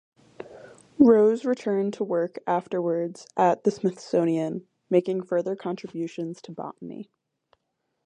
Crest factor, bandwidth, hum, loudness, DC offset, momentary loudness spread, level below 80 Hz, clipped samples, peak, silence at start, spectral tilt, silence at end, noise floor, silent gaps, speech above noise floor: 22 dB; 9.8 kHz; none; -25 LUFS; under 0.1%; 20 LU; -72 dBFS; under 0.1%; -4 dBFS; 0.4 s; -7.5 dB/octave; 1.05 s; -78 dBFS; none; 53 dB